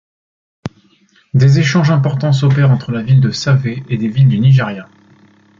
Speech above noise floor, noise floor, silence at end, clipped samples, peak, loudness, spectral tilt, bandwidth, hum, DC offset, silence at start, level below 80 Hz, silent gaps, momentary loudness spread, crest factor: 41 dB; -52 dBFS; 0.75 s; under 0.1%; -2 dBFS; -13 LUFS; -7 dB/octave; 7.4 kHz; none; under 0.1%; 0.65 s; -48 dBFS; none; 19 LU; 12 dB